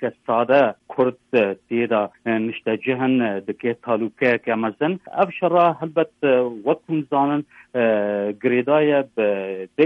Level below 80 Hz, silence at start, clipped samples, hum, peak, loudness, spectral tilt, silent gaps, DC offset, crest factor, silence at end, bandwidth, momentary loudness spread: -68 dBFS; 0 s; under 0.1%; none; -4 dBFS; -21 LUFS; -8.5 dB/octave; none; under 0.1%; 16 dB; 0 s; 5.8 kHz; 7 LU